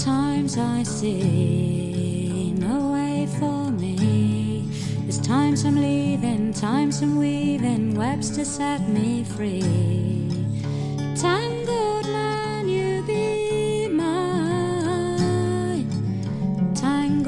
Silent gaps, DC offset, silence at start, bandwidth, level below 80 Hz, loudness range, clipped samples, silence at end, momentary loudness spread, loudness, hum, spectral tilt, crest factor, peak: none; under 0.1%; 0 s; 11.5 kHz; -52 dBFS; 2 LU; under 0.1%; 0 s; 5 LU; -23 LUFS; none; -6.5 dB/octave; 12 dB; -10 dBFS